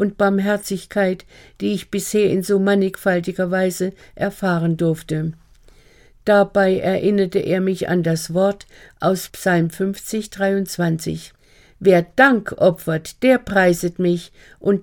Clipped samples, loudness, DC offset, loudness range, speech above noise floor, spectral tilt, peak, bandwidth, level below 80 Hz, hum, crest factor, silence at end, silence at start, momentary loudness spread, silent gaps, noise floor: under 0.1%; -19 LUFS; under 0.1%; 4 LU; 31 dB; -6 dB/octave; 0 dBFS; 17.5 kHz; -50 dBFS; none; 18 dB; 0 s; 0 s; 10 LU; none; -49 dBFS